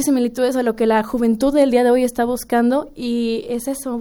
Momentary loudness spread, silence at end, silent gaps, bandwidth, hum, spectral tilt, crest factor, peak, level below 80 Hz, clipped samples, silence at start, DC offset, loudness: 9 LU; 0 s; none; 18 kHz; none; -4.5 dB/octave; 14 dB; -4 dBFS; -46 dBFS; under 0.1%; 0 s; under 0.1%; -18 LUFS